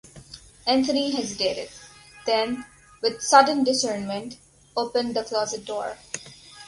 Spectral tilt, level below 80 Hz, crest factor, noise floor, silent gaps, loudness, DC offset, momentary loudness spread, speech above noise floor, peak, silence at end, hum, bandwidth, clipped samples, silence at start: -2.5 dB/octave; -60 dBFS; 24 dB; -46 dBFS; none; -24 LUFS; under 0.1%; 22 LU; 23 dB; -2 dBFS; 0 s; none; 11.5 kHz; under 0.1%; 0.15 s